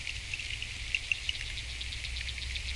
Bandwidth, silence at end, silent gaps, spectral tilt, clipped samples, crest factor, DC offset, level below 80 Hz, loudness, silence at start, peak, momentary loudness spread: 11.5 kHz; 0 s; none; -1 dB/octave; under 0.1%; 24 dB; under 0.1%; -44 dBFS; -35 LUFS; 0 s; -12 dBFS; 6 LU